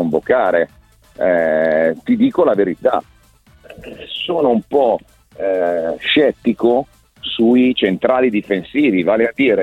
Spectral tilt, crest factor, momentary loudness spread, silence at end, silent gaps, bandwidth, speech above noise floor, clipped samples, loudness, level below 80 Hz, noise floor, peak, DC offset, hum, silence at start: -7 dB/octave; 16 dB; 10 LU; 0 s; none; 8 kHz; 34 dB; under 0.1%; -16 LUFS; -52 dBFS; -50 dBFS; 0 dBFS; under 0.1%; none; 0 s